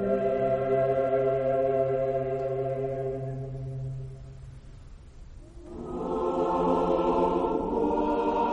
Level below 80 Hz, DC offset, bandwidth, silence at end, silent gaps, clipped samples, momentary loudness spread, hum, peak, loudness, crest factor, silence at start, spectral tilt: -48 dBFS; under 0.1%; 8.8 kHz; 0 s; none; under 0.1%; 16 LU; none; -14 dBFS; -28 LUFS; 14 dB; 0 s; -9 dB/octave